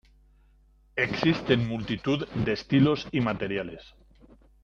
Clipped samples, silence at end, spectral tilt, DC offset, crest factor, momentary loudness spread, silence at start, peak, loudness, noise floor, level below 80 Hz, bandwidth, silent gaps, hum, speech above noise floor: under 0.1%; 0.8 s; -7 dB/octave; under 0.1%; 20 dB; 10 LU; 0.95 s; -8 dBFS; -27 LUFS; -60 dBFS; -52 dBFS; 7.2 kHz; none; none; 34 dB